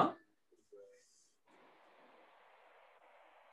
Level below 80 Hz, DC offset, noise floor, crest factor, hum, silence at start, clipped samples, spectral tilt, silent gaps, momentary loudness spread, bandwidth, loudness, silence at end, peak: under -90 dBFS; under 0.1%; -75 dBFS; 28 dB; none; 0 s; under 0.1%; -6 dB/octave; none; 8 LU; 11.5 kHz; -40 LUFS; 2.75 s; -18 dBFS